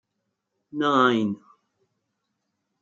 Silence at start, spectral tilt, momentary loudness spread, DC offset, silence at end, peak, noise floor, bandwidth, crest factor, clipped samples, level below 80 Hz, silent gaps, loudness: 0.75 s; -6 dB/octave; 18 LU; under 0.1%; 1.45 s; -6 dBFS; -79 dBFS; 7.6 kHz; 20 dB; under 0.1%; -78 dBFS; none; -22 LUFS